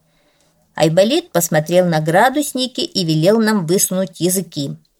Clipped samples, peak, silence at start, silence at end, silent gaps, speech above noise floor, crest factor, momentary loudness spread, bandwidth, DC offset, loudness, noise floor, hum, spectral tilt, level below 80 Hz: under 0.1%; -2 dBFS; 0.75 s; 0.25 s; none; 42 dB; 14 dB; 6 LU; 18.5 kHz; under 0.1%; -16 LUFS; -58 dBFS; none; -4.5 dB/octave; -60 dBFS